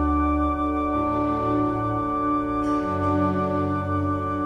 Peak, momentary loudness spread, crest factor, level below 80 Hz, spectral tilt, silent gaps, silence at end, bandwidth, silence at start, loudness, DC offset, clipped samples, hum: -12 dBFS; 2 LU; 12 dB; -36 dBFS; -9 dB/octave; none; 0 s; 6.4 kHz; 0 s; -24 LUFS; under 0.1%; under 0.1%; none